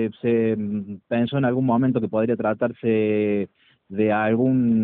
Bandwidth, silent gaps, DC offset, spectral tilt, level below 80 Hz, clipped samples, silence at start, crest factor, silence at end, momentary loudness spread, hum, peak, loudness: 4 kHz; none; under 0.1%; -7 dB/octave; -62 dBFS; under 0.1%; 0 s; 14 dB; 0 s; 7 LU; none; -8 dBFS; -22 LUFS